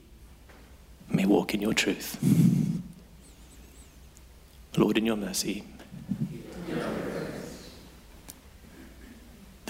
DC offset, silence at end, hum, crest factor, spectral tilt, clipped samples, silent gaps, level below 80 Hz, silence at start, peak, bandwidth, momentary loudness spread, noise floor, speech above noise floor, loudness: under 0.1%; 0 s; none; 20 dB; -5.5 dB/octave; under 0.1%; none; -54 dBFS; 0.1 s; -10 dBFS; 16 kHz; 26 LU; -52 dBFS; 27 dB; -28 LUFS